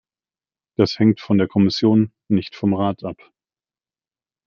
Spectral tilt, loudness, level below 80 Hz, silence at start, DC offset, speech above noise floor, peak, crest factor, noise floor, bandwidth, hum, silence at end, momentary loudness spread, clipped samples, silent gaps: -7.5 dB/octave; -19 LUFS; -60 dBFS; 0.8 s; under 0.1%; over 72 dB; -2 dBFS; 18 dB; under -90 dBFS; 7 kHz; none; 1.3 s; 10 LU; under 0.1%; none